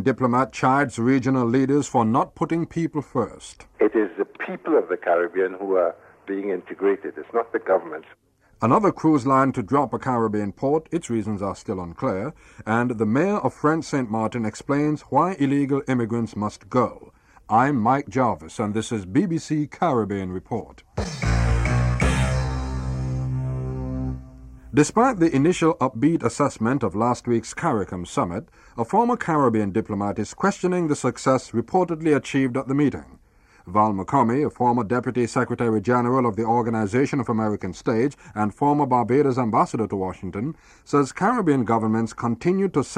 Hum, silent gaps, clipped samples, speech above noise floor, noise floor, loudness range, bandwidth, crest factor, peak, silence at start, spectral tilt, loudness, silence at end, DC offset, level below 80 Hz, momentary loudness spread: none; none; under 0.1%; 33 dB; -55 dBFS; 3 LU; 11.5 kHz; 18 dB; -6 dBFS; 0 s; -7 dB/octave; -23 LUFS; 0 s; under 0.1%; -38 dBFS; 9 LU